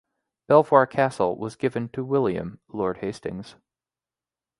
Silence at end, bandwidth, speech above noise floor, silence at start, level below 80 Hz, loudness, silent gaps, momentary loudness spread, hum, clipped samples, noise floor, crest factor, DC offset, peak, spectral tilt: 1.1 s; 11.5 kHz; over 67 dB; 0.5 s; -58 dBFS; -23 LUFS; none; 16 LU; none; under 0.1%; under -90 dBFS; 24 dB; under 0.1%; -2 dBFS; -7 dB/octave